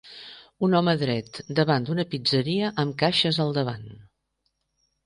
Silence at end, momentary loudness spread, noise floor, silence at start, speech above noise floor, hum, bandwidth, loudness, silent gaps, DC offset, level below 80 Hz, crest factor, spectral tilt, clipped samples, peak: 1.1 s; 12 LU; -76 dBFS; 0.05 s; 52 dB; none; 10.5 kHz; -24 LUFS; none; under 0.1%; -62 dBFS; 18 dB; -6.5 dB/octave; under 0.1%; -8 dBFS